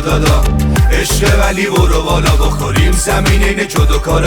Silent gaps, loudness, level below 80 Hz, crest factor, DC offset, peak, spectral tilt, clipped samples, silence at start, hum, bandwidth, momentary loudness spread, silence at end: none; -12 LUFS; -14 dBFS; 10 dB; under 0.1%; 0 dBFS; -5 dB/octave; under 0.1%; 0 s; none; over 20 kHz; 2 LU; 0 s